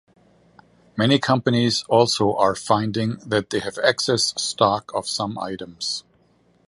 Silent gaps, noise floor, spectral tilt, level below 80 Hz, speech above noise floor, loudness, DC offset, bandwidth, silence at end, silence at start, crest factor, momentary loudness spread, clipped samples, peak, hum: none; -60 dBFS; -4 dB/octave; -56 dBFS; 39 dB; -21 LUFS; under 0.1%; 11.5 kHz; 0.7 s; 0.95 s; 20 dB; 9 LU; under 0.1%; -2 dBFS; none